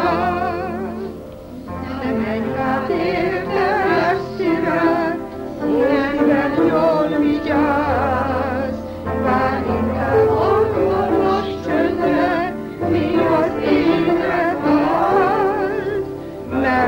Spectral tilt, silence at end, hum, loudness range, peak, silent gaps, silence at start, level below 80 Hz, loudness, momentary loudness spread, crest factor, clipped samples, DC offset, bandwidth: -7.5 dB/octave; 0 s; none; 3 LU; -4 dBFS; none; 0 s; -42 dBFS; -18 LUFS; 9 LU; 14 dB; under 0.1%; under 0.1%; 16.5 kHz